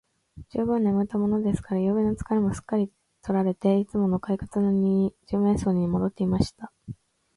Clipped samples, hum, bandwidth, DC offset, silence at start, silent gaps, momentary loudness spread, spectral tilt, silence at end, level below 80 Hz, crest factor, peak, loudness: under 0.1%; none; 11.5 kHz; under 0.1%; 0.35 s; none; 10 LU; -8.5 dB/octave; 0.45 s; -48 dBFS; 18 dB; -8 dBFS; -25 LUFS